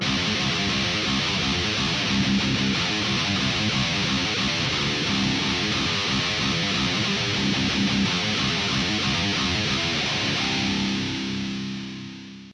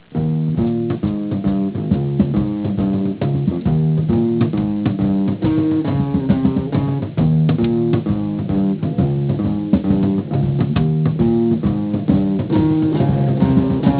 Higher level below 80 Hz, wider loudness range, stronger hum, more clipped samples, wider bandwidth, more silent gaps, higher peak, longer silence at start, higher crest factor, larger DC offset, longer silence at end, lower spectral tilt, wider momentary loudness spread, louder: second, -44 dBFS vs -36 dBFS; about the same, 1 LU vs 2 LU; neither; neither; first, 10.5 kHz vs 4 kHz; neither; second, -10 dBFS vs 0 dBFS; about the same, 0 s vs 0.1 s; about the same, 14 dB vs 16 dB; neither; about the same, 0 s vs 0 s; second, -3.5 dB/octave vs -13 dB/octave; about the same, 4 LU vs 4 LU; second, -22 LUFS vs -18 LUFS